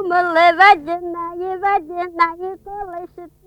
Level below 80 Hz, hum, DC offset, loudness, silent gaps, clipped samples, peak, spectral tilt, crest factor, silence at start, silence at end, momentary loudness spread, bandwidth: -52 dBFS; none; under 0.1%; -16 LUFS; none; under 0.1%; 0 dBFS; -4 dB/octave; 18 dB; 0 s; 0.2 s; 20 LU; 11.5 kHz